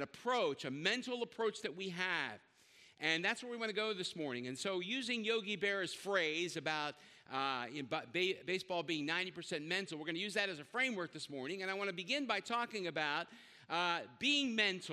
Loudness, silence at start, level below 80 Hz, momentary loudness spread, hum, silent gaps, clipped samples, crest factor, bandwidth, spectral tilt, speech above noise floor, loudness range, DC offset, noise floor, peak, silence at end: -38 LUFS; 0 s; -86 dBFS; 8 LU; none; none; under 0.1%; 20 dB; 13.5 kHz; -3 dB/octave; 26 dB; 1 LU; under 0.1%; -65 dBFS; -18 dBFS; 0 s